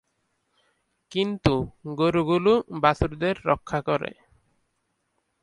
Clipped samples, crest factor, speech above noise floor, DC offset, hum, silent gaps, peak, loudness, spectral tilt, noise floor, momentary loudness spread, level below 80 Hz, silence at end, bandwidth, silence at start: under 0.1%; 22 dB; 51 dB; under 0.1%; none; none; -4 dBFS; -24 LUFS; -7 dB/octave; -75 dBFS; 7 LU; -46 dBFS; 1.3 s; 11 kHz; 1.1 s